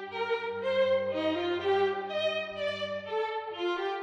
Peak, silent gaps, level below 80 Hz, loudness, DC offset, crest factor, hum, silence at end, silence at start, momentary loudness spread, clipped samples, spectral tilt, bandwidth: -16 dBFS; none; -76 dBFS; -31 LUFS; under 0.1%; 14 dB; none; 0 s; 0 s; 6 LU; under 0.1%; -5 dB/octave; 8.8 kHz